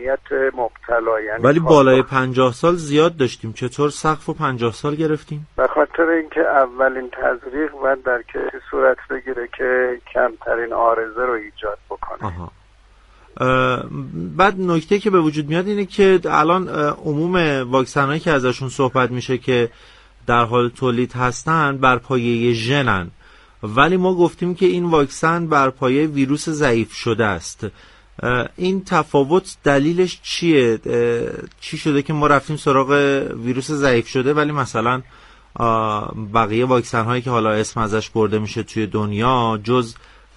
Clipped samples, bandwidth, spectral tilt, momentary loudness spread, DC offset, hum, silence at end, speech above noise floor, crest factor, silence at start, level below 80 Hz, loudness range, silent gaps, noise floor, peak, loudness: under 0.1%; 11.5 kHz; -6 dB/octave; 9 LU; under 0.1%; none; 0.45 s; 32 dB; 18 dB; 0 s; -44 dBFS; 4 LU; none; -50 dBFS; 0 dBFS; -18 LUFS